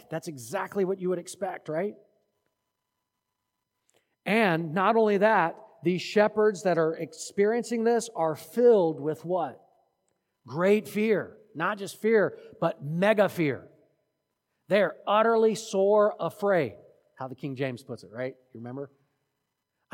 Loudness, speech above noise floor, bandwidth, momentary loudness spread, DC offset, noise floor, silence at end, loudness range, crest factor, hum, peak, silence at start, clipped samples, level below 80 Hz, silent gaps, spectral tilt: -26 LUFS; 57 dB; 17 kHz; 15 LU; under 0.1%; -83 dBFS; 1.1 s; 9 LU; 18 dB; none; -8 dBFS; 0.1 s; under 0.1%; -82 dBFS; none; -5.5 dB/octave